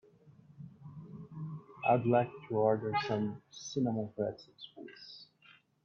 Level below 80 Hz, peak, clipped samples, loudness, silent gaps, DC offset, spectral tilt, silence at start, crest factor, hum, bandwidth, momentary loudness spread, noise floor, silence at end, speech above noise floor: -74 dBFS; -16 dBFS; under 0.1%; -34 LUFS; none; under 0.1%; -6.5 dB/octave; 0.6 s; 20 dB; none; 7.2 kHz; 21 LU; -64 dBFS; 0.6 s; 31 dB